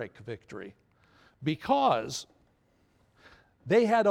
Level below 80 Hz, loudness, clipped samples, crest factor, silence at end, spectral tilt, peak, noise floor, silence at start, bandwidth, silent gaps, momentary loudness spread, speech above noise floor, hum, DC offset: -68 dBFS; -28 LUFS; under 0.1%; 20 dB; 0 s; -5 dB/octave; -12 dBFS; -68 dBFS; 0 s; 15 kHz; none; 23 LU; 40 dB; none; under 0.1%